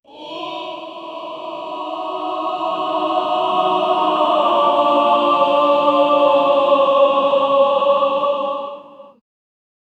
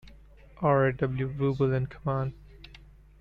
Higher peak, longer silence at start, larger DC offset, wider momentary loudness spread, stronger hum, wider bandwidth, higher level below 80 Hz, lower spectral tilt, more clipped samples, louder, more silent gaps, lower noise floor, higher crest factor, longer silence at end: first, -2 dBFS vs -14 dBFS; about the same, 0.15 s vs 0.05 s; neither; first, 15 LU vs 7 LU; second, none vs 50 Hz at -45 dBFS; first, 8 kHz vs 5.4 kHz; second, -70 dBFS vs -50 dBFS; second, -5 dB/octave vs -10 dB/octave; neither; first, -16 LUFS vs -28 LUFS; neither; second, -37 dBFS vs -52 dBFS; about the same, 16 dB vs 16 dB; first, 0.95 s vs 0.45 s